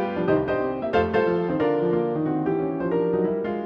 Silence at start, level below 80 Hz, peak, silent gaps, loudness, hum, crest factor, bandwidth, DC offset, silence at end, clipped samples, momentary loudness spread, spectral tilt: 0 s; -50 dBFS; -8 dBFS; none; -23 LUFS; none; 14 dB; 5.8 kHz; under 0.1%; 0 s; under 0.1%; 3 LU; -9.5 dB/octave